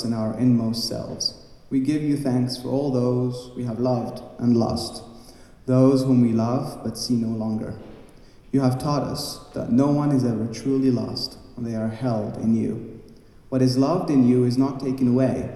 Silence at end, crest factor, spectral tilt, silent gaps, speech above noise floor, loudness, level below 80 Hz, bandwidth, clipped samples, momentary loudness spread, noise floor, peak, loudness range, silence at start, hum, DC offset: 0 s; 18 dB; -7 dB/octave; none; 25 dB; -23 LUFS; -50 dBFS; 13 kHz; under 0.1%; 12 LU; -47 dBFS; -6 dBFS; 3 LU; 0 s; none; under 0.1%